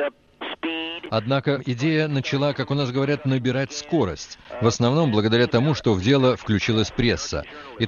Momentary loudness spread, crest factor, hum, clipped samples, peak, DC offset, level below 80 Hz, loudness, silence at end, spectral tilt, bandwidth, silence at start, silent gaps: 10 LU; 18 dB; none; under 0.1%; -4 dBFS; under 0.1%; -46 dBFS; -22 LUFS; 0 s; -6 dB/octave; 7.2 kHz; 0 s; none